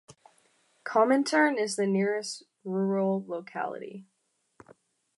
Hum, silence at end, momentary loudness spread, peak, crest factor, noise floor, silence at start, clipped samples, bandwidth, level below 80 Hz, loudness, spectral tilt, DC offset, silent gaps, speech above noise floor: none; 1.15 s; 17 LU; -10 dBFS; 20 dB; -76 dBFS; 0.1 s; under 0.1%; 11.5 kHz; -82 dBFS; -28 LUFS; -5 dB/octave; under 0.1%; none; 48 dB